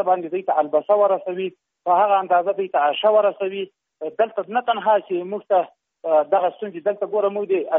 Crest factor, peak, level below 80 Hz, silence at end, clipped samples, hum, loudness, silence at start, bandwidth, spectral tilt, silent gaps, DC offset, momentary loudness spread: 14 dB; -6 dBFS; -78 dBFS; 0 s; under 0.1%; none; -21 LUFS; 0 s; 3.8 kHz; -2.5 dB/octave; none; under 0.1%; 13 LU